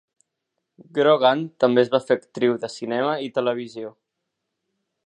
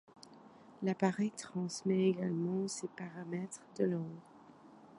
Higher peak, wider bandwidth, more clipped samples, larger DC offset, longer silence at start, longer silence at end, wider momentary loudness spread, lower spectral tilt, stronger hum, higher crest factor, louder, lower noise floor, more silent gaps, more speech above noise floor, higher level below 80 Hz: first, -2 dBFS vs -16 dBFS; second, 10 kHz vs 11.5 kHz; neither; neither; first, 0.95 s vs 0.15 s; first, 1.15 s vs 0 s; about the same, 12 LU vs 14 LU; about the same, -6 dB/octave vs -6 dB/octave; neither; about the same, 20 dB vs 20 dB; first, -21 LUFS vs -37 LUFS; first, -80 dBFS vs -58 dBFS; neither; first, 59 dB vs 22 dB; first, -76 dBFS vs -82 dBFS